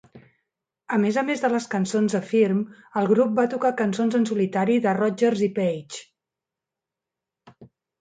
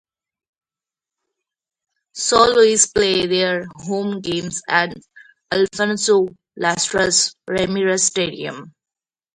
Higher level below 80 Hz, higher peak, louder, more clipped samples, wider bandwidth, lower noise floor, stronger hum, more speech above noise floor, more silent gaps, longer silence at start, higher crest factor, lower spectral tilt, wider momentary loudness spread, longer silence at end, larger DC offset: second, -70 dBFS vs -52 dBFS; second, -8 dBFS vs 0 dBFS; second, -23 LUFS vs -18 LUFS; neither; second, 9.4 kHz vs 11 kHz; about the same, -87 dBFS vs under -90 dBFS; neither; second, 65 dB vs over 72 dB; neither; second, 0.15 s vs 2.15 s; about the same, 16 dB vs 20 dB; first, -6 dB/octave vs -2.5 dB/octave; second, 6 LU vs 12 LU; second, 0.35 s vs 0.65 s; neither